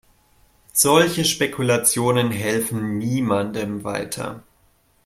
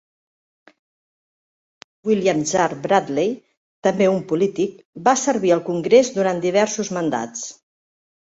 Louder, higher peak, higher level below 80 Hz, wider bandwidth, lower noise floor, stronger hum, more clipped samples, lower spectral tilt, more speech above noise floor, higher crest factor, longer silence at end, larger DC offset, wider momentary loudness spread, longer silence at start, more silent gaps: about the same, -20 LUFS vs -20 LUFS; about the same, -2 dBFS vs -2 dBFS; first, -56 dBFS vs -64 dBFS; first, 16.5 kHz vs 8 kHz; second, -60 dBFS vs under -90 dBFS; neither; neither; about the same, -3.5 dB/octave vs -4.5 dB/octave; second, 39 dB vs over 71 dB; about the same, 20 dB vs 20 dB; second, 0.65 s vs 0.85 s; neither; about the same, 11 LU vs 10 LU; second, 0.75 s vs 2.05 s; second, none vs 3.57-3.82 s, 4.85-4.93 s